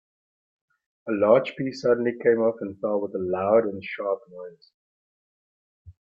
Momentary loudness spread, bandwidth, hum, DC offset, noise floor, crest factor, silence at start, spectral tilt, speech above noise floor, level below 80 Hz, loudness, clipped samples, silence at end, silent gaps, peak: 14 LU; 7.4 kHz; none; under 0.1%; under -90 dBFS; 20 dB; 1.05 s; -7 dB/octave; over 66 dB; -68 dBFS; -24 LUFS; under 0.1%; 0.15 s; 4.74-5.85 s; -6 dBFS